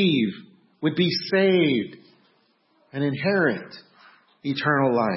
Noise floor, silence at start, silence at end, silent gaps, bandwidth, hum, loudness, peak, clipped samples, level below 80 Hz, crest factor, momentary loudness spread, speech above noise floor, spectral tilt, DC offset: -64 dBFS; 0 s; 0 s; none; 6 kHz; none; -23 LUFS; -8 dBFS; under 0.1%; -68 dBFS; 16 dB; 16 LU; 42 dB; -9.5 dB/octave; under 0.1%